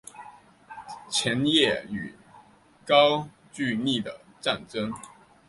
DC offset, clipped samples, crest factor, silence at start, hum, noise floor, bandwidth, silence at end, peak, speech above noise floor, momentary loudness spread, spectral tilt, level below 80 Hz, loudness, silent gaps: under 0.1%; under 0.1%; 22 dB; 0.15 s; none; -55 dBFS; 11.5 kHz; 0.4 s; -6 dBFS; 30 dB; 23 LU; -4 dB/octave; -64 dBFS; -25 LUFS; none